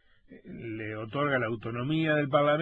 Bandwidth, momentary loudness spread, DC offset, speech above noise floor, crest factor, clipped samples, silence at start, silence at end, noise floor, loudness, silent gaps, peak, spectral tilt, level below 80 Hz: 4.2 kHz; 15 LU; under 0.1%; 25 dB; 18 dB; under 0.1%; 0.3 s; 0 s; -52 dBFS; -29 LUFS; none; -10 dBFS; -9 dB/octave; -62 dBFS